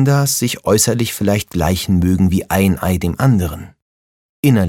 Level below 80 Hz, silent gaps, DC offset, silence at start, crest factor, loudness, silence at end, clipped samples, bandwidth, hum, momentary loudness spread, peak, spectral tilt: -34 dBFS; 3.82-4.43 s; under 0.1%; 0 s; 14 dB; -16 LUFS; 0 s; under 0.1%; 17.5 kHz; none; 4 LU; 0 dBFS; -5.5 dB/octave